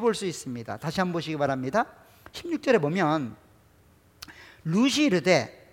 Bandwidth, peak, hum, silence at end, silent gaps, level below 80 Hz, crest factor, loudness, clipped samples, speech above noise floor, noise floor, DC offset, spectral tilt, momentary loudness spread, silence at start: 17 kHz; -6 dBFS; none; 0.2 s; none; -62 dBFS; 20 dB; -26 LUFS; under 0.1%; 33 dB; -59 dBFS; under 0.1%; -5 dB/octave; 19 LU; 0 s